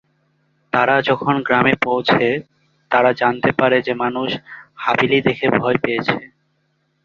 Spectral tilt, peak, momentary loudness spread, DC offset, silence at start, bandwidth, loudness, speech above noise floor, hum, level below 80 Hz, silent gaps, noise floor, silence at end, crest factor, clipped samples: -7 dB/octave; 0 dBFS; 9 LU; under 0.1%; 0.75 s; 7.2 kHz; -17 LUFS; 49 dB; none; -56 dBFS; none; -66 dBFS; 0.8 s; 18 dB; under 0.1%